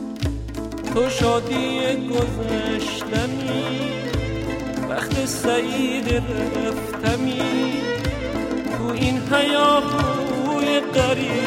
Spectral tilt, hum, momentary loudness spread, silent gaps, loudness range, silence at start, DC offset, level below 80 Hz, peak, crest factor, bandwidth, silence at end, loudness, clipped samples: -5 dB/octave; none; 6 LU; none; 3 LU; 0 s; under 0.1%; -36 dBFS; -4 dBFS; 18 dB; 16.5 kHz; 0 s; -22 LUFS; under 0.1%